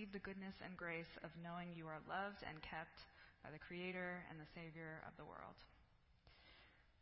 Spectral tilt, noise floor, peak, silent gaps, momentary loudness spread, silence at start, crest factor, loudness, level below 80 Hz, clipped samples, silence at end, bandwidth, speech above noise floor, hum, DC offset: -4 dB/octave; -73 dBFS; -34 dBFS; none; 18 LU; 0 s; 18 dB; -52 LUFS; -74 dBFS; under 0.1%; 0 s; 5.6 kHz; 21 dB; none; under 0.1%